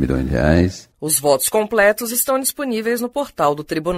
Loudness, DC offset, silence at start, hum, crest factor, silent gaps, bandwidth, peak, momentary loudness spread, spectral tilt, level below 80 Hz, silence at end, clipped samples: -18 LUFS; under 0.1%; 0 s; none; 16 dB; none; 16 kHz; -2 dBFS; 7 LU; -4.5 dB/octave; -34 dBFS; 0 s; under 0.1%